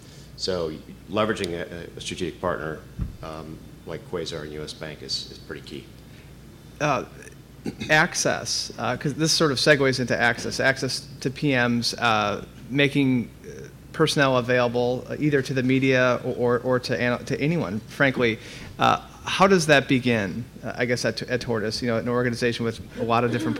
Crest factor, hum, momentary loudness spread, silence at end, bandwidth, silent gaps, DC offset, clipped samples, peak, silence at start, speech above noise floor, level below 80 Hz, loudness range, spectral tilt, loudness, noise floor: 18 dB; none; 17 LU; 0 s; 16.5 kHz; none; under 0.1%; under 0.1%; -6 dBFS; 0 s; 21 dB; -50 dBFS; 10 LU; -4.5 dB/octave; -23 LUFS; -45 dBFS